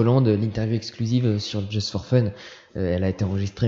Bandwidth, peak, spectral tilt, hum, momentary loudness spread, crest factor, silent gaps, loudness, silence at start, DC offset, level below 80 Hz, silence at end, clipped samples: 7.6 kHz; -6 dBFS; -7 dB/octave; none; 8 LU; 16 dB; none; -24 LUFS; 0 s; under 0.1%; -50 dBFS; 0 s; under 0.1%